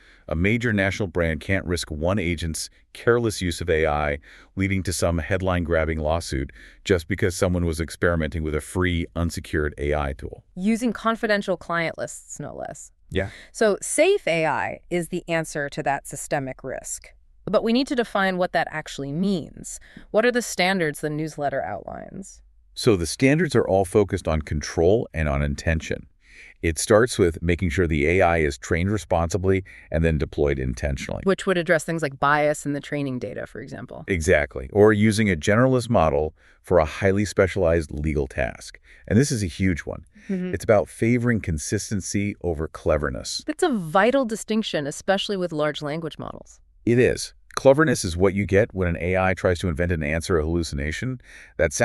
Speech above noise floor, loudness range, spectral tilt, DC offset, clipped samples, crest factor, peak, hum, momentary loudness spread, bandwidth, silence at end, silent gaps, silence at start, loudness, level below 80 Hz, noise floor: 26 dB; 4 LU; -5.5 dB/octave; under 0.1%; under 0.1%; 20 dB; -2 dBFS; none; 12 LU; 13.5 kHz; 0 s; none; 0.3 s; -23 LUFS; -38 dBFS; -49 dBFS